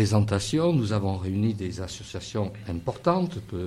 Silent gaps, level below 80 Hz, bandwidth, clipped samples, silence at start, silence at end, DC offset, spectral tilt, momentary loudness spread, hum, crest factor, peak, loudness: none; -50 dBFS; 12.5 kHz; under 0.1%; 0 s; 0 s; under 0.1%; -6.5 dB/octave; 9 LU; none; 16 dB; -10 dBFS; -27 LUFS